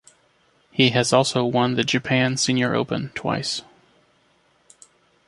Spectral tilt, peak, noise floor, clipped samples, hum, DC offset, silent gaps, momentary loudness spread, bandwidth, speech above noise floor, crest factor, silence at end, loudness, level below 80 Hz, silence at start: -4.5 dB/octave; 0 dBFS; -62 dBFS; under 0.1%; none; under 0.1%; none; 8 LU; 11.5 kHz; 41 dB; 22 dB; 1.65 s; -21 LUFS; -60 dBFS; 0.75 s